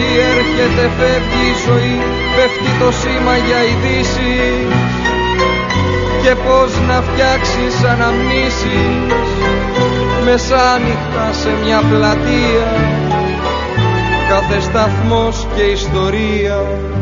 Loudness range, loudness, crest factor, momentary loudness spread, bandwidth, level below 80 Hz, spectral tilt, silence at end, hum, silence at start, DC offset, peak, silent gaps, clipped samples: 1 LU; -13 LUFS; 12 dB; 4 LU; 7.6 kHz; -24 dBFS; -4 dB/octave; 0 s; none; 0 s; under 0.1%; 0 dBFS; none; under 0.1%